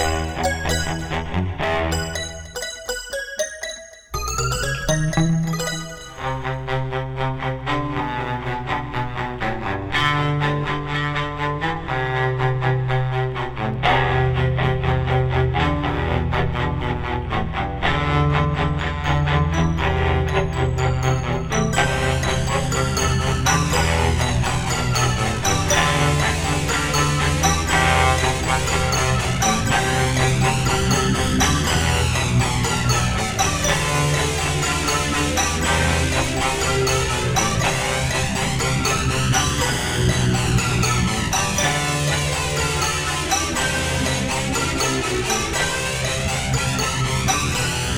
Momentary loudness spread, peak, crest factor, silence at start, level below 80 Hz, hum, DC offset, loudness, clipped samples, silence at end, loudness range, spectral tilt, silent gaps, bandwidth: 7 LU; -4 dBFS; 18 dB; 0 s; -30 dBFS; none; under 0.1%; -20 LUFS; under 0.1%; 0 s; 5 LU; -4 dB/octave; none; over 20 kHz